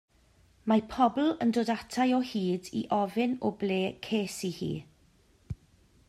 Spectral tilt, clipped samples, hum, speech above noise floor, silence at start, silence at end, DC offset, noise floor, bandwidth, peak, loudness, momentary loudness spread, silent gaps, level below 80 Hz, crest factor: -5.5 dB/octave; under 0.1%; none; 35 dB; 0.65 s; 0.55 s; under 0.1%; -64 dBFS; 14 kHz; -12 dBFS; -30 LUFS; 13 LU; none; -60 dBFS; 20 dB